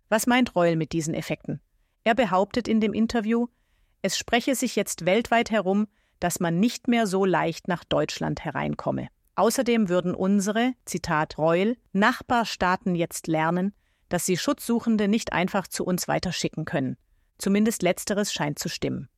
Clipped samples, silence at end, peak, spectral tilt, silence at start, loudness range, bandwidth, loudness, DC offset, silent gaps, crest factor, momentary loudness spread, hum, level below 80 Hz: under 0.1%; 0.1 s; -6 dBFS; -4.5 dB/octave; 0.1 s; 2 LU; 16 kHz; -25 LUFS; under 0.1%; none; 18 dB; 8 LU; none; -54 dBFS